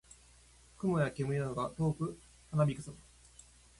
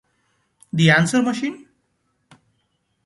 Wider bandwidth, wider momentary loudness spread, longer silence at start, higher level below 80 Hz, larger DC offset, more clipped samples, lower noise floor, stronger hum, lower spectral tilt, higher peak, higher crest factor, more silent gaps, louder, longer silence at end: about the same, 11.5 kHz vs 11.5 kHz; about the same, 15 LU vs 14 LU; about the same, 0.8 s vs 0.75 s; about the same, -60 dBFS vs -62 dBFS; neither; neither; second, -61 dBFS vs -69 dBFS; neither; first, -7.5 dB/octave vs -5 dB/octave; second, -18 dBFS vs -2 dBFS; about the same, 20 dB vs 20 dB; neither; second, -35 LUFS vs -18 LUFS; second, 0.8 s vs 1.5 s